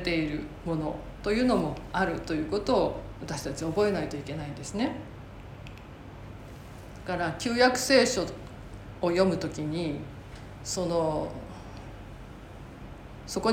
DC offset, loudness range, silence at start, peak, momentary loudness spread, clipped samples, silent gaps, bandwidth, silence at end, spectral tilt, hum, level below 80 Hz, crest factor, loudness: under 0.1%; 8 LU; 0 s; -8 dBFS; 21 LU; under 0.1%; none; 16.5 kHz; 0 s; -4.5 dB/octave; none; -48 dBFS; 20 dB; -29 LUFS